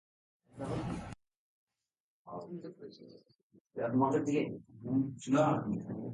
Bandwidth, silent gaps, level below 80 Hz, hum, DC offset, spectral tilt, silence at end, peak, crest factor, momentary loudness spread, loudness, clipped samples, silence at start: 11 kHz; 1.37-1.67 s, 2.00-2.25 s, 3.43-3.50 s, 3.60-3.65 s; -64 dBFS; none; under 0.1%; -7.5 dB/octave; 0 s; -16 dBFS; 20 dB; 20 LU; -34 LUFS; under 0.1%; 0.55 s